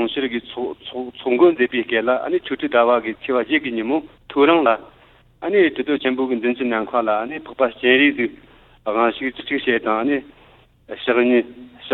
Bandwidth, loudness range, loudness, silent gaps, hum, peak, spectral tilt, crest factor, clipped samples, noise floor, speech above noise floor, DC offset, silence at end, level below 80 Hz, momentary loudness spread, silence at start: 4.2 kHz; 2 LU; -19 LUFS; none; none; -2 dBFS; -8 dB/octave; 18 dB; under 0.1%; -51 dBFS; 32 dB; under 0.1%; 0 s; -58 dBFS; 12 LU; 0 s